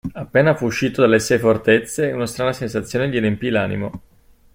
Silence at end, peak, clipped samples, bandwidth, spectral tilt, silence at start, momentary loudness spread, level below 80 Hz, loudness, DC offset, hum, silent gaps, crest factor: 0.55 s; -2 dBFS; under 0.1%; 16.5 kHz; -5.5 dB/octave; 0.05 s; 8 LU; -48 dBFS; -18 LUFS; under 0.1%; none; none; 16 dB